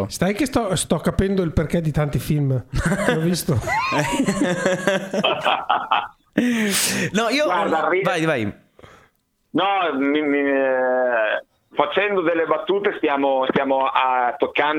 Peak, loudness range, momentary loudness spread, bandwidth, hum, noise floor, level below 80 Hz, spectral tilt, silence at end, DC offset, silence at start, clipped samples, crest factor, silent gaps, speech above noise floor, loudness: 0 dBFS; 1 LU; 4 LU; 19.5 kHz; none; -62 dBFS; -40 dBFS; -4.5 dB/octave; 0 s; under 0.1%; 0 s; under 0.1%; 20 dB; none; 42 dB; -20 LUFS